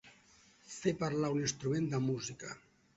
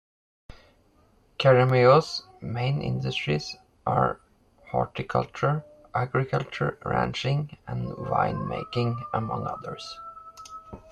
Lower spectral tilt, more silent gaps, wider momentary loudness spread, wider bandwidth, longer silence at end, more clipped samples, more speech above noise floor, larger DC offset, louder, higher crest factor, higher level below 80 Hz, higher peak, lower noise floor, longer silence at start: about the same, -6 dB/octave vs -6.5 dB/octave; neither; second, 14 LU vs 19 LU; second, 8 kHz vs 9 kHz; first, 0.4 s vs 0.15 s; neither; second, 30 dB vs 36 dB; neither; second, -36 LUFS vs -26 LUFS; about the same, 18 dB vs 22 dB; second, -68 dBFS vs -54 dBFS; second, -18 dBFS vs -6 dBFS; first, -65 dBFS vs -61 dBFS; second, 0.05 s vs 0.5 s